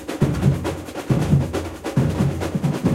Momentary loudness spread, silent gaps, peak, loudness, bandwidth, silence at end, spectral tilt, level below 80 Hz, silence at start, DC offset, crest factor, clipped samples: 8 LU; none; -4 dBFS; -22 LUFS; 15.5 kHz; 0 s; -7.5 dB/octave; -36 dBFS; 0 s; under 0.1%; 18 dB; under 0.1%